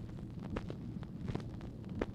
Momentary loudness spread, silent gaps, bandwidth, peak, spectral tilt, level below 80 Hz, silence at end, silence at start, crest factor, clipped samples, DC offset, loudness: 4 LU; none; 11 kHz; -18 dBFS; -8 dB/octave; -52 dBFS; 0 s; 0 s; 24 dB; under 0.1%; under 0.1%; -44 LUFS